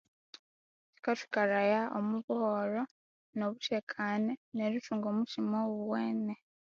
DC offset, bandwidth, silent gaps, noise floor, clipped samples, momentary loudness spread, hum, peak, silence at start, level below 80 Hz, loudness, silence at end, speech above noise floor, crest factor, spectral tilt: under 0.1%; 7.2 kHz; 2.24-2.28 s, 2.91-3.33 s, 3.83-3.87 s, 4.37-4.52 s; under -90 dBFS; under 0.1%; 7 LU; none; -18 dBFS; 1.05 s; -82 dBFS; -34 LUFS; 0.35 s; over 57 dB; 16 dB; -4.5 dB/octave